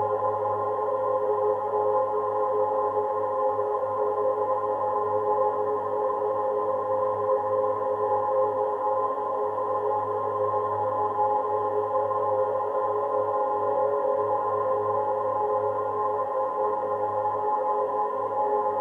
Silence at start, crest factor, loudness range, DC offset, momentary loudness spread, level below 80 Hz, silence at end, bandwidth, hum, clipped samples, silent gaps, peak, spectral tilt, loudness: 0 s; 12 dB; 1 LU; under 0.1%; 2 LU; -72 dBFS; 0 s; 3.6 kHz; none; under 0.1%; none; -14 dBFS; -8 dB/octave; -26 LUFS